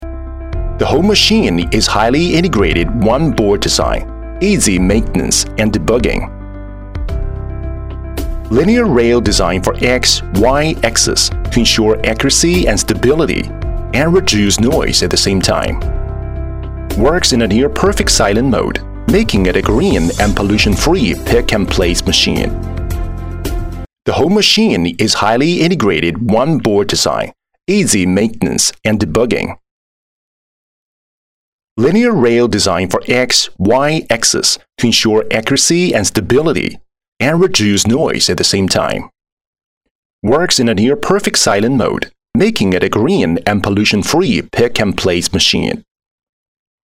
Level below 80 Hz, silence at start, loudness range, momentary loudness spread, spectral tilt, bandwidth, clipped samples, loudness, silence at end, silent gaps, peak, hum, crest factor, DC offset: -24 dBFS; 0 s; 4 LU; 12 LU; -4 dB/octave; 16.5 kHz; under 0.1%; -12 LUFS; 1.05 s; 29.71-31.76 s, 37.08-37.17 s, 39.32-39.37 s, 39.47-39.53 s, 39.64-39.81 s, 39.91-40.19 s; 0 dBFS; none; 12 dB; under 0.1%